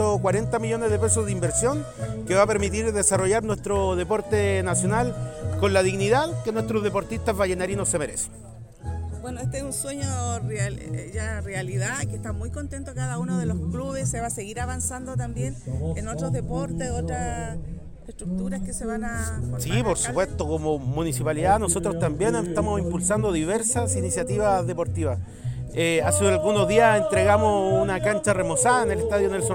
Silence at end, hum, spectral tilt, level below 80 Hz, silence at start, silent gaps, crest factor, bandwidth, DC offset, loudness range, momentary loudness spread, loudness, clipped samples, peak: 0 s; none; -5 dB/octave; -40 dBFS; 0 s; none; 18 dB; 17 kHz; under 0.1%; 8 LU; 11 LU; -24 LUFS; under 0.1%; -6 dBFS